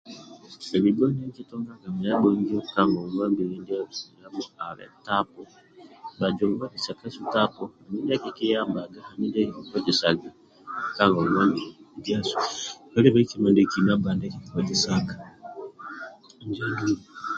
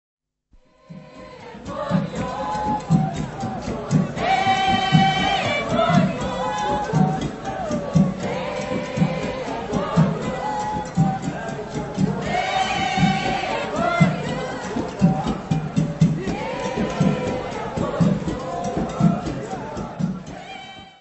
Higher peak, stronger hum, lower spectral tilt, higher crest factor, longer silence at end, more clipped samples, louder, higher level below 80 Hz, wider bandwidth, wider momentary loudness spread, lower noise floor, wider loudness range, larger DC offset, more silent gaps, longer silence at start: about the same, -4 dBFS vs -2 dBFS; neither; about the same, -5.5 dB/octave vs -6 dB/octave; about the same, 22 dB vs 20 dB; about the same, 0 s vs 0.1 s; neither; second, -25 LUFS vs -22 LUFS; second, -58 dBFS vs -44 dBFS; about the same, 7.8 kHz vs 8.4 kHz; first, 19 LU vs 10 LU; second, -44 dBFS vs -56 dBFS; about the same, 7 LU vs 5 LU; neither; neither; second, 0.05 s vs 0.9 s